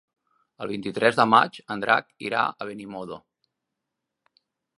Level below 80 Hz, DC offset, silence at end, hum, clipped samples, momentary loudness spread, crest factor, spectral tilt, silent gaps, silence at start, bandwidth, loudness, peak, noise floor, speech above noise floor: -70 dBFS; under 0.1%; 1.6 s; none; under 0.1%; 18 LU; 24 dB; -5 dB/octave; none; 0.6 s; 11.5 kHz; -23 LUFS; -2 dBFS; -84 dBFS; 60 dB